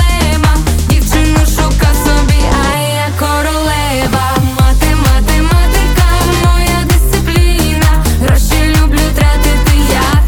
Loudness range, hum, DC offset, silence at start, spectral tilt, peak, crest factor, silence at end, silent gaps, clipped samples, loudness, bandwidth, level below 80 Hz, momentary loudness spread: 1 LU; none; under 0.1%; 0 s; -5 dB/octave; 0 dBFS; 8 dB; 0 s; none; under 0.1%; -11 LUFS; 19.5 kHz; -12 dBFS; 2 LU